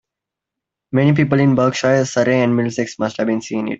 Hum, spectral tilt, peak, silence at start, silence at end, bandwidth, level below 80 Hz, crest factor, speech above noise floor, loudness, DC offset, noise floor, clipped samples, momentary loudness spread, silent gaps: none; -6.5 dB/octave; -2 dBFS; 0.9 s; 0 s; 8 kHz; -54 dBFS; 14 dB; 68 dB; -17 LUFS; under 0.1%; -84 dBFS; under 0.1%; 7 LU; none